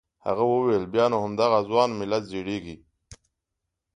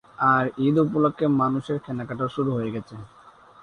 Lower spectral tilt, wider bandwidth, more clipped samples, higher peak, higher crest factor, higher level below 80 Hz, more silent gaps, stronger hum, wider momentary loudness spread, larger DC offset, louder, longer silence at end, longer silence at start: second, -6 dB/octave vs -9 dB/octave; about the same, 10.5 kHz vs 9.8 kHz; neither; about the same, -6 dBFS vs -6 dBFS; about the same, 20 dB vs 18 dB; about the same, -58 dBFS vs -60 dBFS; neither; neither; about the same, 10 LU vs 12 LU; neither; about the same, -24 LUFS vs -23 LUFS; first, 0.8 s vs 0.55 s; about the same, 0.25 s vs 0.2 s